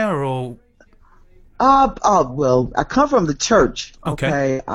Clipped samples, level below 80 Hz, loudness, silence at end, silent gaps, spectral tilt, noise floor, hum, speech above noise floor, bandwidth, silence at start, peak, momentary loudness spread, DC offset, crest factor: under 0.1%; -38 dBFS; -17 LUFS; 0 s; none; -5 dB/octave; -51 dBFS; none; 34 dB; 11.5 kHz; 0 s; -2 dBFS; 11 LU; under 0.1%; 16 dB